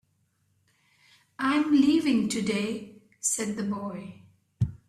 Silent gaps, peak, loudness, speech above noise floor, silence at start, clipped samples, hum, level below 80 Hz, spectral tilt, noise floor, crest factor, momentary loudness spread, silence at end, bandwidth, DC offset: none; -12 dBFS; -26 LUFS; 45 dB; 1.4 s; under 0.1%; none; -58 dBFS; -4.5 dB/octave; -71 dBFS; 18 dB; 16 LU; 0.1 s; 14 kHz; under 0.1%